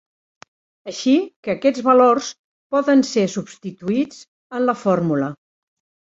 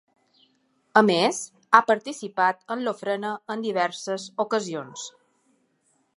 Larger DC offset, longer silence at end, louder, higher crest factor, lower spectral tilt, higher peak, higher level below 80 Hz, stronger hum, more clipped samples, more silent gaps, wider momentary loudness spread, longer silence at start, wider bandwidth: neither; second, 0.7 s vs 1.1 s; first, -19 LUFS vs -24 LUFS; second, 18 dB vs 26 dB; first, -5.5 dB/octave vs -3.5 dB/octave; about the same, -2 dBFS vs 0 dBFS; first, -64 dBFS vs -78 dBFS; neither; neither; first, 1.36-1.43 s, 2.39-2.70 s, 4.28-4.50 s vs none; about the same, 16 LU vs 15 LU; about the same, 0.85 s vs 0.95 s; second, 8 kHz vs 11.5 kHz